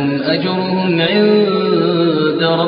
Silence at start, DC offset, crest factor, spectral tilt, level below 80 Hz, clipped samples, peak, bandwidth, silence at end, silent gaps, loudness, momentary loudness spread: 0 s; under 0.1%; 12 dB; -4.5 dB/octave; -58 dBFS; under 0.1%; -2 dBFS; 5.2 kHz; 0 s; none; -14 LUFS; 4 LU